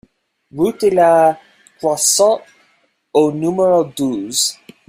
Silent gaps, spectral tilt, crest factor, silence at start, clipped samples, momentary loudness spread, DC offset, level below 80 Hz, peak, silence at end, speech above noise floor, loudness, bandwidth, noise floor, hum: none; -3.5 dB/octave; 16 dB; 0.55 s; under 0.1%; 10 LU; under 0.1%; -58 dBFS; 0 dBFS; 0.35 s; 45 dB; -15 LUFS; 16 kHz; -59 dBFS; none